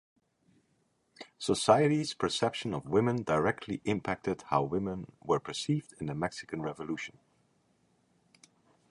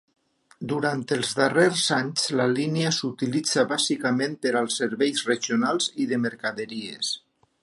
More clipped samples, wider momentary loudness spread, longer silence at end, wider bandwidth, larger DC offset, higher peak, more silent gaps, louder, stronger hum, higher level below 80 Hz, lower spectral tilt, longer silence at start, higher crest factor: neither; first, 12 LU vs 8 LU; first, 1.85 s vs 0.45 s; about the same, 11.5 kHz vs 11.5 kHz; neither; about the same, -8 dBFS vs -6 dBFS; neither; second, -32 LUFS vs -24 LUFS; neither; first, -62 dBFS vs -72 dBFS; first, -5.5 dB/octave vs -3.5 dB/octave; first, 1.2 s vs 0.6 s; about the same, 24 dB vs 20 dB